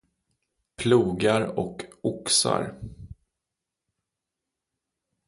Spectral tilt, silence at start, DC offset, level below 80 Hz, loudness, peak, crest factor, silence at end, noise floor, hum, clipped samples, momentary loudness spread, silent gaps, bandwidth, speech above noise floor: -4 dB/octave; 0.8 s; under 0.1%; -56 dBFS; -24 LUFS; -8 dBFS; 22 dB; 2.15 s; -86 dBFS; none; under 0.1%; 14 LU; none; 11.5 kHz; 62 dB